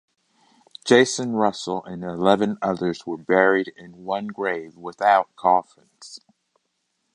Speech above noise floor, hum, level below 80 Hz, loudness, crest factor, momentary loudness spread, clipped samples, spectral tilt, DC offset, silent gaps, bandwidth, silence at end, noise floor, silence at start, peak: 52 dB; none; -64 dBFS; -21 LUFS; 22 dB; 16 LU; under 0.1%; -4.5 dB/octave; under 0.1%; none; 11 kHz; 0.95 s; -74 dBFS; 0.85 s; -2 dBFS